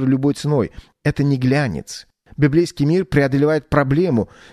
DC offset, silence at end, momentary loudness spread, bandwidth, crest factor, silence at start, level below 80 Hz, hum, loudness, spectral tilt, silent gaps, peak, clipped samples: under 0.1%; 0.25 s; 10 LU; 13 kHz; 18 dB; 0 s; -42 dBFS; none; -18 LUFS; -7.5 dB/octave; none; 0 dBFS; under 0.1%